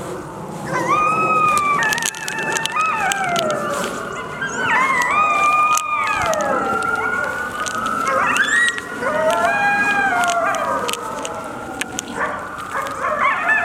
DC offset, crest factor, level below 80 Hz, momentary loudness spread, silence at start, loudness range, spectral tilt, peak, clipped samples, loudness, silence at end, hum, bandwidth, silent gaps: under 0.1%; 20 dB; -52 dBFS; 11 LU; 0 s; 3 LU; -2.5 dB/octave; 0 dBFS; under 0.1%; -18 LUFS; 0 s; none; 17.5 kHz; none